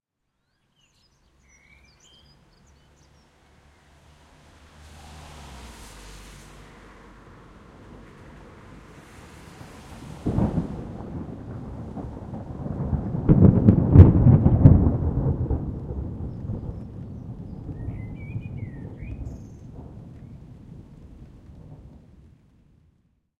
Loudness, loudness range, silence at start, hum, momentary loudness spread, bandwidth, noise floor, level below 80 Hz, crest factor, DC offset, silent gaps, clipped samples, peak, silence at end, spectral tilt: -21 LUFS; 28 LU; 5.1 s; none; 29 LU; 8 kHz; -76 dBFS; -36 dBFS; 24 dB; under 0.1%; none; under 0.1%; 0 dBFS; 1.65 s; -10 dB/octave